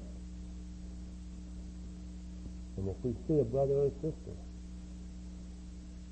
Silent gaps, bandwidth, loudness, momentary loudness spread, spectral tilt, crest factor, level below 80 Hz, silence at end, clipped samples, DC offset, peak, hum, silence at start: none; 8.4 kHz; -39 LUFS; 17 LU; -8.5 dB/octave; 20 dB; -46 dBFS; 0 s; under 0.1%; under 0.1%; -18 dBFS; none; 0 s